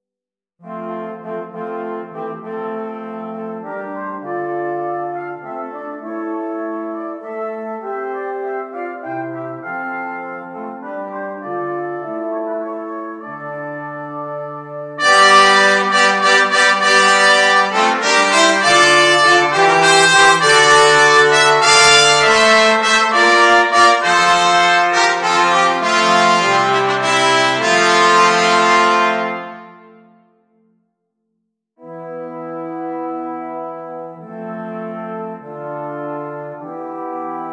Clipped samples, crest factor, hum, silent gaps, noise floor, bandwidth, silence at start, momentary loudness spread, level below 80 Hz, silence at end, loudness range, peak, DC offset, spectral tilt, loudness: under 0.1%; 16 dB; none; none; -88 dBFS; 10 kHz; 0.65 s; 19 LU; -58 dBFS; 0 s; 18 LU; 0 dBFS; under 0.1%; -2 dB/octave; -12 LUFS